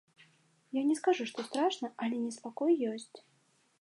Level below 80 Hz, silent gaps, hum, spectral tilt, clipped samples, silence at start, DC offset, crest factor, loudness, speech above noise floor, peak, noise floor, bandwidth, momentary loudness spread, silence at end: under -90 dBFS; none; none; -4 dB/octave; under 0.1%; 0.75 s; under 0.1%; 18 dB; -33 LUFS; 39 dB; -16 dBFS; -71 dBFS; 11.5 kHz; 9 LU; 0.6 s